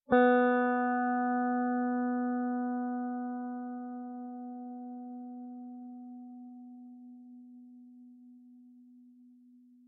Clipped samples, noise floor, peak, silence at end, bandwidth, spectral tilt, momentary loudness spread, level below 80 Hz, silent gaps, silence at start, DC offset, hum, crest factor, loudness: under 0.1%; -59 dBFS; -12 dBFS; 0.85 s; 4 kHz; -4 dB/octave; 24 LU; -76 dBFS; none; 0.1 s; under 0.1%; none; 20 dB; -32 LUFS